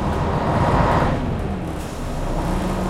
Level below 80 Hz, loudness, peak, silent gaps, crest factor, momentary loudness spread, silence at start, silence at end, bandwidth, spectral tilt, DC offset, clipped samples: -28 dBFS; -21 LUFS; -4 dBFS; none; 18 dB; 10 LU; 0 s; 0 s; 16 kHz; -7 dB/octave; under 0.1%; under 0.1%